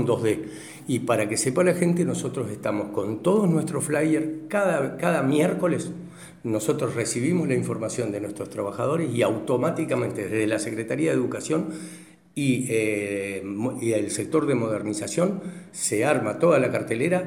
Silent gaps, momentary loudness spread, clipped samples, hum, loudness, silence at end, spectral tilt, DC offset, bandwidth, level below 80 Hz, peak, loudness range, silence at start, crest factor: none; 9 LU; under 0.1%; none; -25 LUFS; 0 s; -5.5 dB/octave; under 0.1%; 16.5 kHz; -66 dBFS; -6 dBFS; 3 LU; 0 s; 18 dB